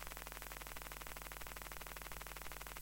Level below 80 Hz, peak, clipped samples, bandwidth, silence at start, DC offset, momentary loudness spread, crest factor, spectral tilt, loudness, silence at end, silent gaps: -56 dBFS; -30 dBFS; under 0.1%; 17 kHz; 0 s; under 0.1%; 0 LU; 20 dB; -2 dB/octave; -49 LUFS; 0 s; none